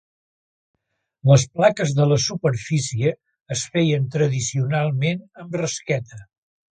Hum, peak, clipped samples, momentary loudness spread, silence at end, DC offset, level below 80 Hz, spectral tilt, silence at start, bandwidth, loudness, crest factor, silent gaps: none; -2 dBFS; under 0.1%; 11 LU; 0.5 s; under 0.1%; -54 dBFS; -5.5 dB/octave; 1.25 s; 9.4 kHz; -21 LUFS; 20 dB; 3.42-3.46 s